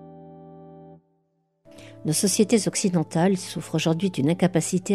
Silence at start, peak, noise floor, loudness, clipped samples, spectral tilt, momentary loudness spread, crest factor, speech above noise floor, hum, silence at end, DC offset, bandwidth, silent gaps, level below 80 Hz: 0 s; -8 dBFS; -70 dBFS; -23 LUFS; under 0.1%; -5 dB/octave; 6 LU; 18 dB; 48 dB; none; 0 s; under 0.1%; 14.5 kHz; none; -64 dBFS